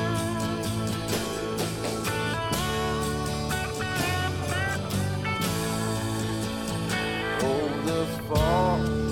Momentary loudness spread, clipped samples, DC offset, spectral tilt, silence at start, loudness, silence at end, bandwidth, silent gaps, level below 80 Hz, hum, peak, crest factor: 4 LU; under 0.1%; under 0.1%; -5 dB/octave; 0 s; -27 LUFS; 0 s; 18 kHz; none; -42 dBFS; none; -10 dBFS; 18 dB